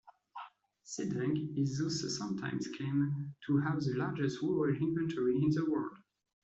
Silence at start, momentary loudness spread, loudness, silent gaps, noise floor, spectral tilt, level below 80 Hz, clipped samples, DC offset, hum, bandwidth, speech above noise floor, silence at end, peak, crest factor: 0.05 s; 13 LU; -34 LUFS; none; -56 dBFS; -6.5 dB/octave; -70 dBFS; under 0.1%; under 0.1%; none; 8 kHz; 22 dB; 0.5 s; -20 dBFS; 14 dB